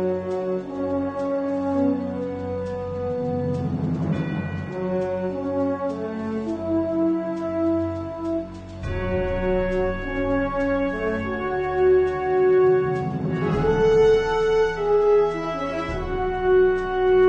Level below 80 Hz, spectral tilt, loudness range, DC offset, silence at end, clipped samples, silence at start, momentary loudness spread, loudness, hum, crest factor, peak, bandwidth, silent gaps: -40 dBFS; -8 dB/octave; 6 LU; under 0.1%; 0 s; under 0.1%; 0 s; 10 LU; -23 LUFS; none; 14 dB; -8 dBFS; 7.8 kHz; none